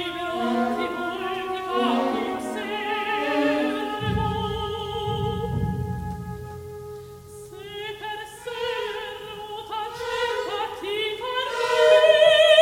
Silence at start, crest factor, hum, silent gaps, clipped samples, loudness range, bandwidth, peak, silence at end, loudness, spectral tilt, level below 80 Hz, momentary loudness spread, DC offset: 0 s; 20 dB; none; none; under 0.1%; 10 LU; 16.5 kHz; -4 dBFS; 0 s; -24 LUFS; -5 dB/octave; -46 dBFS; 18 LU; under 0.1%